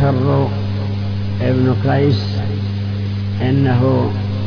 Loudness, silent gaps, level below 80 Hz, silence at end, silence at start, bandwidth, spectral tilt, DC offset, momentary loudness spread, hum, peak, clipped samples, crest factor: -17 LUFS; none; -40 dBFS; 0 s; 0 s; 5.4 kHz; -9 dB/octave; under 0.1%; 7 LU; 50 Hz at -20 dBFS; -4 dBFS; under 0.1%; 12 dB